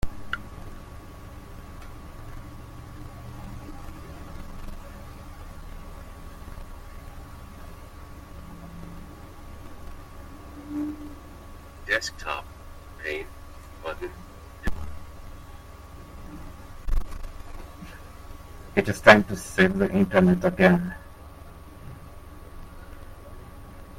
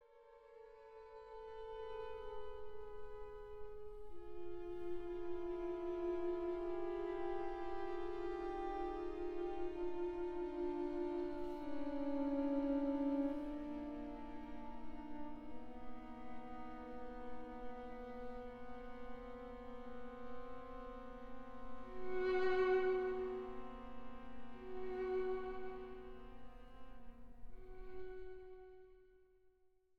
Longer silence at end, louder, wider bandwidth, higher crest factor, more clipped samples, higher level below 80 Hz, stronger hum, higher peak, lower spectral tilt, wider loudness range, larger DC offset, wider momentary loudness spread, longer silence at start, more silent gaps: second, 0 s vs 0.5 s; first, -24 LUFS vs -45 LUFS; first, 16.5 kHz vs 6.4 kHz; first, 28 dB vs 16 dB; neither; first, -40 dBFS vs -58 dBFS; neither; first, 0 dBFS vs -26 dBFS; second, -6 dB/octave vs -7.5 dB/octave; first, 23 LU vs 12 LU; neither; first, 25 LU vs 18 LU; about the same, 0 s vs 0.05 s; neither